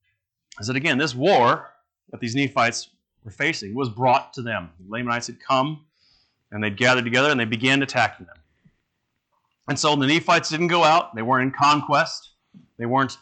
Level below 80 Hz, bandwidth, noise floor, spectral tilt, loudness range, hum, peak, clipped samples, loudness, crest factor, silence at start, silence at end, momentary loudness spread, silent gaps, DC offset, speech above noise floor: -66 dBFS; 9.2 kHz; -76 dBFS; -4.5 dB/octave; 5 LU; none; -8 dBFS; under 0.1%; -21 LUFS; 16 dB; 0.55 s; 0.05 s; 12 LU; none; under 0.1%; 55 dB